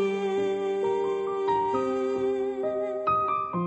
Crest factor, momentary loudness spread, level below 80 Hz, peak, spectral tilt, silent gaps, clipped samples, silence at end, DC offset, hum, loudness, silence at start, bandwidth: 12 dB; 3 LU; -62 dBFS; -14 dBFS; -7 dB/octave; none; under 0.1%; 0 s; under 0.1%; none; -27 LUFS; 0 s; 8.4 kHz